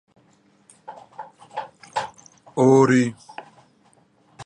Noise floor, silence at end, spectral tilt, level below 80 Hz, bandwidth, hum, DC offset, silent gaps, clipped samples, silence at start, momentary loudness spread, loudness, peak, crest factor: -59 dBFS; 0 s; -6.5 dB/octave; -66 dBFS; 10.5 kHz; none; under 0.1%; none; under 0.1%; 0.9 s; 26 LU; -20 LUFS; -4 dBFS; 20 dB